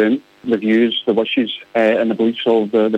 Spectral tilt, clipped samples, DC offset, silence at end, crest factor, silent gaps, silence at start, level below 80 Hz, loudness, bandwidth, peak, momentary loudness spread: -7 dB/octave; under 0.1%; under 0.1%; 0 s; 12 dB; none; 0 s; -66 dBFS; -17 LUFS; 7.8 kHz; -4 dBFS; 5 LU